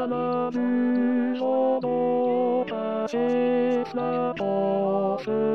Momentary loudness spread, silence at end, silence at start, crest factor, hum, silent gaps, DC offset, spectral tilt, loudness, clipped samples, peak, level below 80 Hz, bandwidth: 4 LU; 0 s; 0 s; 10 dB; none; none; 0.2%; -8 dB/octave; -25 LUFS; under 0.1%; -14 dBFS; -70 dBFS; 6.6 kHz